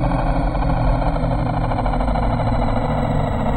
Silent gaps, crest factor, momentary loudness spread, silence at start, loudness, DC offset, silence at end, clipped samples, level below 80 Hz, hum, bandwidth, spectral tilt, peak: none; 12 dB; 1 LU; 0 s; -20 LUFS; under 0.1%; 0 s; under 0.1%; -22 dBFS; none; 9 kHz; -8.5 dB/octave; -6 dBFS